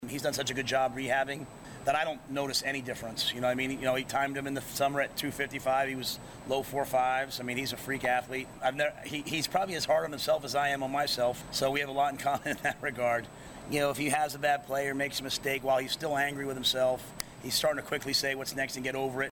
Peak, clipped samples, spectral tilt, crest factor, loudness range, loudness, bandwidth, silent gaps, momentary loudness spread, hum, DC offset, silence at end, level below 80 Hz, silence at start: -8 dBFS; under 0.1%; -3 dB/octave; 24 dB; 2 LU; -31 LUFS; 18 kHz; none; 6 LU; none; under 0.1%; 0 s; -60 dBFS; 0 s